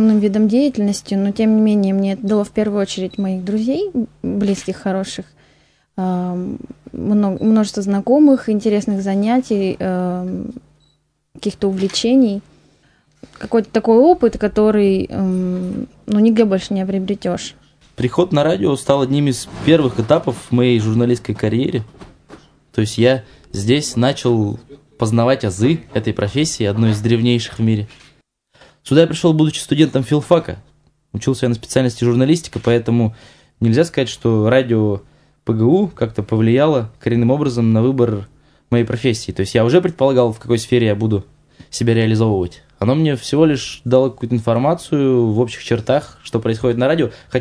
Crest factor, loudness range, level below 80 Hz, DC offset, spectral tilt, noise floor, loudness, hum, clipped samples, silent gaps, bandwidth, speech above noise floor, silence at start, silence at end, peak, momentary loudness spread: 16 dB; 4 LU; -46 dBFS; under 0.1%; -6.5 dB/octave; -62 dBFS; -17 LUFS; none; under 0.1%; none; 11 kHz; 46 dB; 0 s; 0 s; 0 dBFS; 9 LU